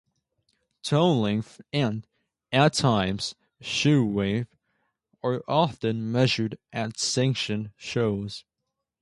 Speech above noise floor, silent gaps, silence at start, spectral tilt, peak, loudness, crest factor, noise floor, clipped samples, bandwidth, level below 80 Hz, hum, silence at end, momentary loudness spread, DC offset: 58 dB; none; 0.85 s; -5 dB/octave; -8 dBFS; -25 LUFS; 20 dB; -83 dBFS; under 0.1%; 11.5 kHz; -56 dBFS; none; 0.6 s; 11 LU; under 0.1%